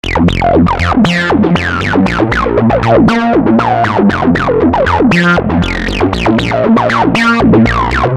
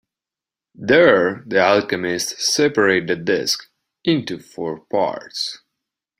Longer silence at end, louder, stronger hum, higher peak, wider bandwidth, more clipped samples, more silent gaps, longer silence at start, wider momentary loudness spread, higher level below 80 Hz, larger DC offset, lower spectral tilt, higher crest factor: second, 0 s vs 0.65 s; first, -10 LUFS vs -18 LUFS; neither; about the same, -2 dBFS vs -2 dBFS; second, 11 kHz vs 16 kHz; neither; neither; second, 0.05 s vs 0.8 s; second, 4 LU vs 14 LU; first, -24 dBFS vs -60 dBFS; neither; first, -7 dB/octave vs -3.5 dB/octave; second, 8 dB vs 18 dB